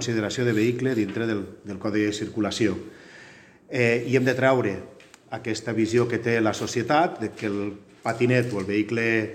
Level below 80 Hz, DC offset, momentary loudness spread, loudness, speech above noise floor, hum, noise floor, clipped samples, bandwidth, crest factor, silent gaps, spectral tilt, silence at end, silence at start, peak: -64 dBFS; under 0.1%; 13 LU; -24 LUFS; 25 dB; none; -49 dBFS; under 0.1%; 14 kHz; 20 dB; none; -5.5 dB/octave; 0 s; 0 s; -4 dBFS